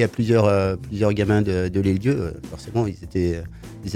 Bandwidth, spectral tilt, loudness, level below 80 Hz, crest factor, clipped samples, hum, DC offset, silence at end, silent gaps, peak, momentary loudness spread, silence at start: 13.5 kHz; -7.5 dB/octave; -22 LUFS; -42 dBFS; 18 dB; under 0.1%; none; under 0.1%; 0 s; none; -4 dBFS; 13 LU; 0 s